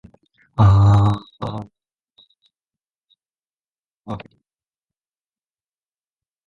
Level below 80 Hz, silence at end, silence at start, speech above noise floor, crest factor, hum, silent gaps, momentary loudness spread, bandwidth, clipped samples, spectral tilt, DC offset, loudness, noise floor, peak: -36 dBFS; 2.3 s; 0.6 s; over 74 dB; 20 dB; none; 2.04-2.08 s, 2.96-3.01 s, 3.39-3.43 s, 3.68-3.83 s, 3.99-4.03 s; 20 LU; 7.4 kHz; under 0.1%; -8.5 dB/octave; under 0.1%; -17 LUFS; under -90 dBFS; -2 dBFS